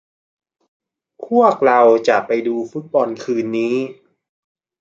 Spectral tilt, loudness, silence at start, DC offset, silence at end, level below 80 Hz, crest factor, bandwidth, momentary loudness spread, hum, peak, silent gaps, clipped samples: -6 dB/octave; -16 LUFS; 1.2 s; under 0.1%; 0.9 s; -70 dBFS; 16 dB; 7.6 kHz; 11 LU; none; -2 dBFS; none; under 0.1%